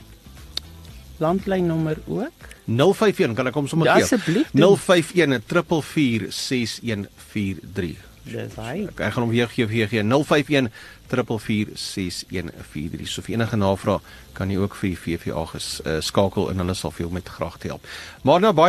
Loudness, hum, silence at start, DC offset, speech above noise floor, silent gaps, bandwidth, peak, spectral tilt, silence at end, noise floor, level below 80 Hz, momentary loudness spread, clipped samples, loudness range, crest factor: -22 LUFS; none; 0 s; under 0.1%; 21 dB; none; 13 kHz; -2 dBFS; -5.5 dB/octave; 0 s; -43 dBFS; -48 dBFS; 15 LU; under 0.1%; 7 LU; 20 dB